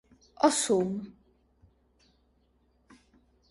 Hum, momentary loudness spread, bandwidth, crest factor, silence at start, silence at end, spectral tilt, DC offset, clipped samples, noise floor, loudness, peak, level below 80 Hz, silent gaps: none; 15 LU; 11.5 kHz; 24 dB; 0.4 s; 2.4 s; -3.5 dB/octave; under 0.1%; under 0.1%; -69 dBFS; -27 LUFS; -8 dBFS; -68 dBFS; none